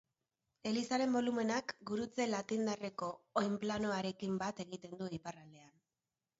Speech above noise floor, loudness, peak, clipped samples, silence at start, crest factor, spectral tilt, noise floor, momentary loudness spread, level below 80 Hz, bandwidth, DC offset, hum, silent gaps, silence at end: over 52 dB; -39 LUFS; -18 dBFS; under 0.1%; 0.65 s; 20 dB; -4.5 dB/octave; under -90 dBFS; 11 LU; -74 dBFS; 7.6 kHz; under 0.1%; none; none; 0.7 s